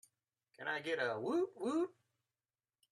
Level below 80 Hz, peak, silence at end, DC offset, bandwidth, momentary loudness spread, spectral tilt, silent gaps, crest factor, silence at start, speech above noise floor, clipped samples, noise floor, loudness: -90 dBFS; -24 dBFS; 1 s; under 0.1%; 12 kHz; 6 LU; -5 dB/octave; none; 18 dB; 0.6 s; over 52 dB; under 0.1%; under -90 dBFS; -39 LUFS